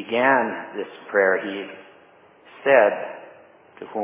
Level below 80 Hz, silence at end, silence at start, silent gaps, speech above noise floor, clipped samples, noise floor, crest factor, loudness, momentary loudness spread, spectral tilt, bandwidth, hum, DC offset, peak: -80 dBFS; 0 s; 0 s; none; 31 dB; under 0.1%; -52 dBFS; 20 dB; -20 LUFS; 19 LU; -8 dB/octave; 3.8 kHz; none; under 0.1%; -4 dBFS